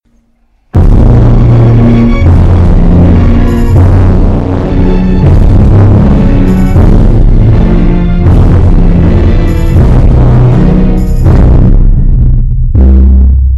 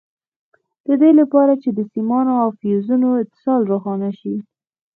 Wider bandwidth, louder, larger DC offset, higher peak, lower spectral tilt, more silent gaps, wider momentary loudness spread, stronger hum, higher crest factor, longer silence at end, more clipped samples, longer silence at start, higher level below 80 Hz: first, 5.4 kHz vs 4 kHz; first, -6 LUFS vs -17 LUFS; neither; about the same, 0 dBFS vs -2 dBFS; second, -9.5 dB/octave vs -12 dB/octave; neither; second, 4 LU vs 12 LU; neither; second, 4 dB vs 16 dB; second, 0 s vs 0.55 s; neither; second, 0.75 s vs 0.9 s; first, -6 dBFS vs -72 dBFS